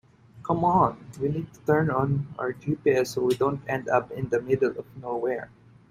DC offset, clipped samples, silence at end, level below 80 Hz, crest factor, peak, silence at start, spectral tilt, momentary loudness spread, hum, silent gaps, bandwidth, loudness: under 0.1%; under 0.1%; 0.45 s; -56 dBFS; 18 dB; -8 dBFS; 0.35 s; -7 dB/octave; 9 LU; none; none; 15.5 kHz; -26 LUFS